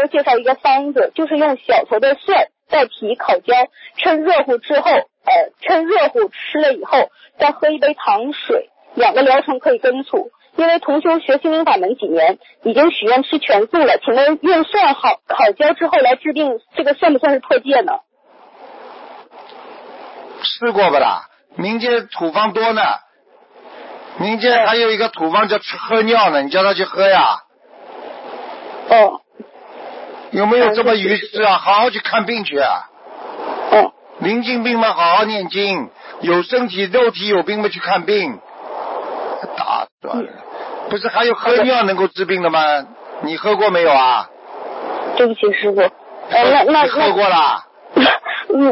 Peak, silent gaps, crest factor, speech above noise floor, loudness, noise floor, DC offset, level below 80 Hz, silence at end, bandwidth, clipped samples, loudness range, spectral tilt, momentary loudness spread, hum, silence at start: 0 dBFS; 39.92-39.98 s; 14 dB; 36 dB; -15 LUFS; -51 dBFS; under 0.1%; -64 dBFS; 0 s; 5.8 kHz; under 0.1%; 5 LU; -8.5 dB/octave; 13 LU; none; 0 s